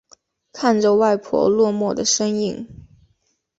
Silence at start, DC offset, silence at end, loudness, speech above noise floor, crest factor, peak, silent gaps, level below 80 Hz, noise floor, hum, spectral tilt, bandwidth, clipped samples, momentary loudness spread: 0.55 s; under 0.1%; 0.75 s; -18 LUFS; 49 dB; 16 dB; -4 dBFS; none; -56 dBFS; -67 dBFS; none; -4 dB/octave; 8 kHz; under 0.1%; 9 LU